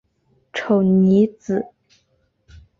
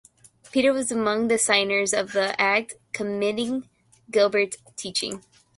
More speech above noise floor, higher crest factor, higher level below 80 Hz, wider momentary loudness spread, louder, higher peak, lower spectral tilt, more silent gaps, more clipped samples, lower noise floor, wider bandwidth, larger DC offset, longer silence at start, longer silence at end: first, 49 dB vs 28 dB; about the same, 16 dB vs 20 dB; first, -56 dBFS vs -66 dBFS; first, 15 LU vs 12 LU; first, -18 LUFS vs -23 LUFS; about the same, -6 dBFS vs -4 dBFS; first, -8.5 dB/octave vs -2.5 dB/octave; neither; neither; first, -65 dBFS vs -51 dBFS; second, 7 kHz vs 11.5 kHz; neither; about the same, 0.55 s vs 0.55 s; first, 1.15 s vs 0.4 s